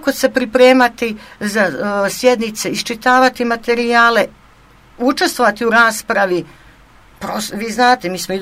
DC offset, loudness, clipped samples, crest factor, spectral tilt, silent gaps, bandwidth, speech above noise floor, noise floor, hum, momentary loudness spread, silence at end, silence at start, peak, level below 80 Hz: under 0.1%; -14 LUFS; under 0.1%; 14 dB; -3.5 dB/octave; none; 16 kHz; 31 dB; -46 dBFS; none; 11 LU; 0 s; 0 s; 0 dBFS; -50 dBFS